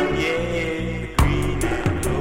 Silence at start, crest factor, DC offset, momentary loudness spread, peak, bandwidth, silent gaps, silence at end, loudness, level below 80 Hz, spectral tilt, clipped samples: 0 s; 16 dB; under 0.1%; 4 LU; -4 dBFS; 17 kHz; none; 0 s; -23 LUFS; -28 dBFS; -5.5 dB/octave; under 0.1%